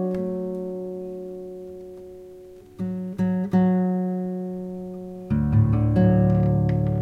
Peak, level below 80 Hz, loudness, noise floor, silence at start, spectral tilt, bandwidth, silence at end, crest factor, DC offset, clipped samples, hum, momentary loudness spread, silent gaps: -8 dBFS; -40 dBFS; -23 LUFS; -44 dBFS; 0 s; -11 dB/octave; 4.2 kHz; 0 s; 16 dB; under 0.1%; under 0.1%; none; 19 LU; none